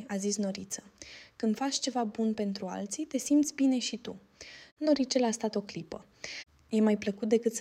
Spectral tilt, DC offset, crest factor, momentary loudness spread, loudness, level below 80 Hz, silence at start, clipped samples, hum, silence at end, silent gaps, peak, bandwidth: -4 dB/octave; under 0.1%; 18 dB; 18 LU; -31 LUFS; -70 dBFS; 0 s; under 0.1%; none; 0 s; 4.72-4.77 s; -14 dBFS; 15.5 kHz